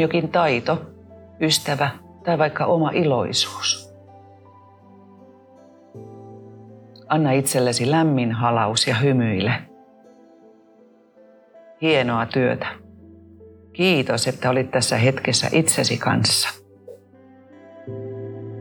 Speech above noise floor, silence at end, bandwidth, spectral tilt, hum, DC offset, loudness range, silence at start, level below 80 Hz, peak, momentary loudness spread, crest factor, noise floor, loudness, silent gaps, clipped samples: 33 dB; 0 s; over 20 kHz; -4 dB/octave; none; under 0.1%; 6 LU; 0 s; -62 dBFS; -4 dBFS; 16 LU; 18 dB; -53 dBFS; -20 LUFS; none; under 0.1%